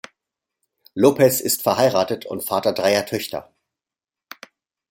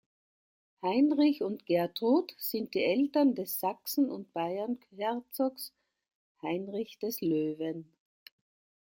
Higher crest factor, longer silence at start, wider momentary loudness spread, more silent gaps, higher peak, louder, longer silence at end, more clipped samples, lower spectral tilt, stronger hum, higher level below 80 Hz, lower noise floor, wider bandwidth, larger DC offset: about the same, 20 dB vs 16 dB; about the same, 0.95 s vs 0.85 s; about the same, 12 LU vs 10 LU; second, none vs 6.15-6.35 s; first, -2 dBFS vs -16 dBFS; first, -19 LUFS vs -31 LUFS; first, 1.5 s vs 1.05 s; neither; second, -4 dB/octave vs -5.5 dB/octave; neither; first, -64 dBFS vs -80 dBFS; about the same, -90 dBFS vs under -90 dBFS; about the same, 17 kHz vs 17 kHz; neither